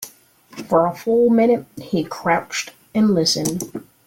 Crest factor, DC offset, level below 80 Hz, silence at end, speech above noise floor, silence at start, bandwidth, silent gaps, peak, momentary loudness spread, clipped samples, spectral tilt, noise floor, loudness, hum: 16 dB; under 0.1%; -58 dBFS; 0.25 s; 30 dB; 0 s; 17 kHz; none; -4 dBFS; 14 LU; under 0.1%; -4.5 dB/octave; -48 dBFS; -19 LUFS; none